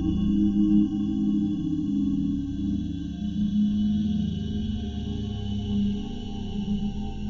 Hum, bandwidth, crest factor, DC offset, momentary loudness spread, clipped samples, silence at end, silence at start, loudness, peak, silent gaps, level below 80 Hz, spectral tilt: none; 6.8 kHz; 14 dB; under 0.1%; 9 LU; under 0.1%; 0 s; 0 s; -27 LUFS; -10 dBFS; none; -38 dBFS; -8.5 dB/octave